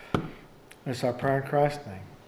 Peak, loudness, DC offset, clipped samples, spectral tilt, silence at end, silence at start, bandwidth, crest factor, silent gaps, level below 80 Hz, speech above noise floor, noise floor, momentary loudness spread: -8 dBFS; -29 LUFS; under 0.1%; under 0.1%; -6.5 dB/octave; 0.05 s; 0 s; 14.5 kHz; 22 dB; none; -54 dBFS; 23 dB; -51 dBFS; 16 LU